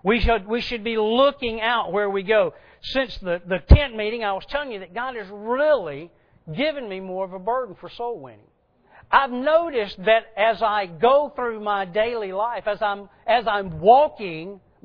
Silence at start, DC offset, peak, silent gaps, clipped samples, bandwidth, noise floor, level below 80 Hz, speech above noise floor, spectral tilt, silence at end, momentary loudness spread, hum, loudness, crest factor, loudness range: 0.05 s; under 0.1%; 0 dBFS; none; under 0.1%; 5.4 kHz; -57 dBFS; -30 dBFS; 35 dB; -8 dB/octave; 0.25 s; 14 LU; none; -22 LUFS; 22 dB; 5 LU